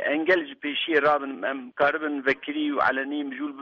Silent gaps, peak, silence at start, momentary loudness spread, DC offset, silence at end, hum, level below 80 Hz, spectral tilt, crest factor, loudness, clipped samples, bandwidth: none; -8 dBFS; 0 s; 9 LU; under 0.1%; 0 s; none; -68 dBFS; -5.5 dB/octave; 18 dB; -25 LUFS; under 0.1%; 6.8 kHz